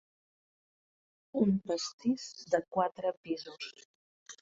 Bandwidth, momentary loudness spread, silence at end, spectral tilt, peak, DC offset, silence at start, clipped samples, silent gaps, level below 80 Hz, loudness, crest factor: 7.8 kHz; 14 LU; 0.05 s; -5.5 dB/octave; -14 dBFS; under 0.1%; 1.35 s; under 0.1%; 1.93-1.98 s, 3.17-3.24 s, 3.85-4.26 s; -72 dBFS; -34 LUFS; 22 dB